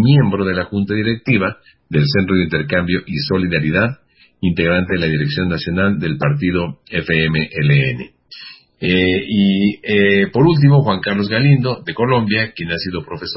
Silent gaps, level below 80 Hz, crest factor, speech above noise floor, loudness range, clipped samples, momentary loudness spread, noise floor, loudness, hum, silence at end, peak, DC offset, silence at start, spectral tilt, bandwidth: none; -38 dBFS; 16 dB; 23 dB; 4 LU; under 0.1%; 9 LU; -38 dBFS; -16 LUFS; none; 0 s; 0 dBFS; under 0.1%; 0 s; -11 dB/octave; 5.8 kHz